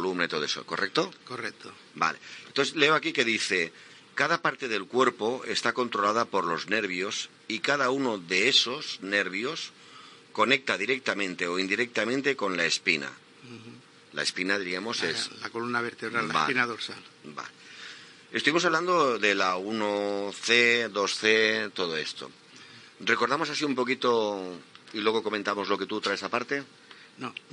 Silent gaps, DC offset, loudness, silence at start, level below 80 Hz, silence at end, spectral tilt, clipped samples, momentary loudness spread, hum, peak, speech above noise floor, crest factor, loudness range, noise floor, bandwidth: none; under 0.1%; -27 LUFS; 0 s; -84 dBFS; 0.2 s; -3 dB/octave; under 0.1%; 17 LU; none; -6 dBFS; 22 dB; 22 dB; 5 LU; -50 dBFS; 11 kHz